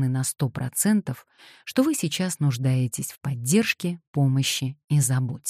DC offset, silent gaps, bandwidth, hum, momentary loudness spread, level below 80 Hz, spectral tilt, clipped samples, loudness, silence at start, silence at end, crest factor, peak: under 0.1%; 4.07-4.13 s, 4.84-4.88 s; 15 kHz; none; 8 LU; -64 dBFS; -5 dB/octave; under 0.1%; -24 LUFS; 0 s; 0 s; 16 dB; -8 dBFS